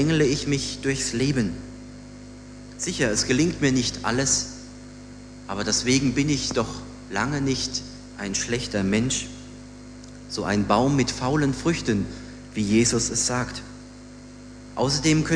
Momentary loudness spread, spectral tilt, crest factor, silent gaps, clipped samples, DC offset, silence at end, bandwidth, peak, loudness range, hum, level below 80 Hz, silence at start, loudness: 22 LU; -4 dB/octave; 20 dB; none; under 0.1%; under 0.1%; 0 s; 10.5 kHz; -4 dBFS; 3 LU; 50 Hz at -45 dBFS; -44 dBFS; 0 s; -24 LUFS